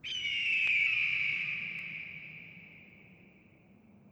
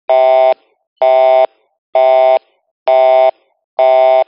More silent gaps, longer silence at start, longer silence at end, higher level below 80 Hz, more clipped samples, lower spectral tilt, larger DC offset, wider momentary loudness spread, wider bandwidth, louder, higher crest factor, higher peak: second, none vs 0.87-0.96 s, 1.78-1.93 s, 2.71-2.86 s, 3.64-3.77 s; about the same, 0.05 s vs 0.1 s; about the same, 0.05 s vs 0.05 s; first, -74 dBFS vs -90 dBFS; neither; first, -1 dB/octave vs 3.5 dB/octave; neither; first, 21 LU vs 9 LU; first, over 20 kHz vs 5.4 kHz; second, -30 LUFS vs -11 LUFS; first, 18 dB vs 10 dB; second, -18 dBFS vs -2 dBFS